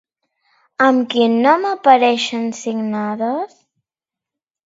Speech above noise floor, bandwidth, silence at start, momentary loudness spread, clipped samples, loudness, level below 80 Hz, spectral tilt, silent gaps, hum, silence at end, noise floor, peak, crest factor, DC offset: 72 dB; 7.8 kHz; 0.8 s; 10 LU; under 0.1%; -16 LUFS; -70 dBFS; -4.5 dB/octave; none; none; 1.2 s; -88 dBFS; 0 dBFS; 18 dB; under 0.1%